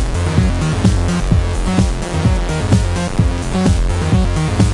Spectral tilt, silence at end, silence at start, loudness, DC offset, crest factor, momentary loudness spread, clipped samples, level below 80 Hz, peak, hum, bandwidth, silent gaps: -6 dB/octave; 0 s; 0 s; -16 LUFS; under 0.1%; 14 dB; 2 LU; under 0.1%; -20 dBFS; 0 dBFS; none; 11.5 kHz; none